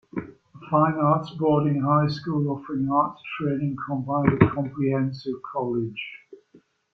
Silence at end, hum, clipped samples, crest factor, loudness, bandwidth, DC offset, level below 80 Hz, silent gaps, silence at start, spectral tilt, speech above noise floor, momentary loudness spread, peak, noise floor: 0.6 s; none; under 0.1%; 22 dB; -24 LUFS; 6.4 kHz; under 0.1%; -56 dBFS; none; 0.15 s; -9.5 dB/octave; 35 dB; 11 LU; -2 dBFS; -58 dBFS